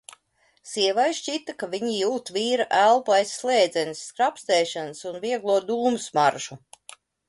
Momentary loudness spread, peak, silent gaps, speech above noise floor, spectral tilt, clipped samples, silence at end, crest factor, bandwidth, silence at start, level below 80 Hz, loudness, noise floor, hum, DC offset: 12 LU; -6 dBFS; none; 42 dB; -2.5 dB/octave; under 0.1%; 0.7 s; 18 dB; 11.5 kHz; 0.65 s; -72 dBFS; -24 LUFS; -65 dBFS; none; under 0.1%